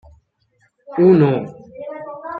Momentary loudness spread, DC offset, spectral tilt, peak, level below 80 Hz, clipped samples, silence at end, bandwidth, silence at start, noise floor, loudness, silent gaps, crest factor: 21 LU; under 0.1%; -11 dB/octave; -2 dBFS; -56 dBFS; under 0.1%; 0 s; 4.7 kHz; 0.9 s; -62 dBFS; -15 LUFS; none; 16 dB